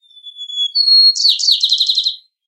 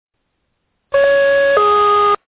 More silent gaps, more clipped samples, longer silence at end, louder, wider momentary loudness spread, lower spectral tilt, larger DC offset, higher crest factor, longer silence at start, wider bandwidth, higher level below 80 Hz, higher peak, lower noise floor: neither; neither; first, 0.3 s vs 0.15 s; about the same, -10 LUFS vs -12 LUFS; first, 13 LU vs 3 LU; second, 14.5 dB/octave vs -6.5 dB/octave; neither; about the same, 14 dB vs 14 dB; second, 0.25 s vs 0.9 s; first, 13 kHz vs 4 kHz; second, under -90 dBFS vs -50 dBFS; about the same, 0 dBFS vs 0 dBFS; second, -33 dBFS vs -69 dBFS